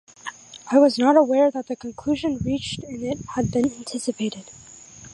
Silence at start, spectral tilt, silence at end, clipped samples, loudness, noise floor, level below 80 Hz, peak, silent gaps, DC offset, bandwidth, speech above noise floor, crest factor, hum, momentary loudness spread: 0.25 s; -5.5 dB/octave; 0 s; under 0.1%; -22 LUFS; -44 dBFS; -50 dBFS; -4 dBFS; none; under 0.1%; 11.5 kHz; 23 dB; 20 dB; none; 23 LU